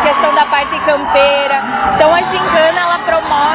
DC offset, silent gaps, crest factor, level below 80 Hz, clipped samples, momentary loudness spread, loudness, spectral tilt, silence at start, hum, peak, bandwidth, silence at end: under 0.1%; none; 12 dB; -40 dBFS; under 0.1%; 4 LU; -11 LUFS; -7.5 dB/octave; 0 s; none; 0 dBFS; 4 kHz; 0 s